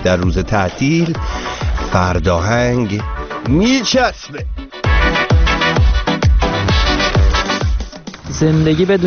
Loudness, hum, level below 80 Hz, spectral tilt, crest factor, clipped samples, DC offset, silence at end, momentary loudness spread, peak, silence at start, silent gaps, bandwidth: -15 LUFS; none; -20 dBFS; -4.5 dB/octave; 14 dB; under 0.1%; under 0.1%; 0 s; 11 LU; 0 dBFS; 0 s; none; 6.8 kHz